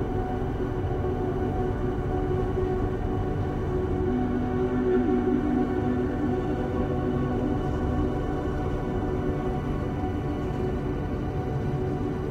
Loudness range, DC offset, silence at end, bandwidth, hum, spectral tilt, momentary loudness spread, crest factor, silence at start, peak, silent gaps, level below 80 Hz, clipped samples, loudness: 3 LU; under 0.1%; 0 s; 9.4 kHz; none; -9 dB/octave; 5 LU; 14 dB; 0 s; -12 dBFS; none; -36 dBFS; under 0.1%; -28 LUFS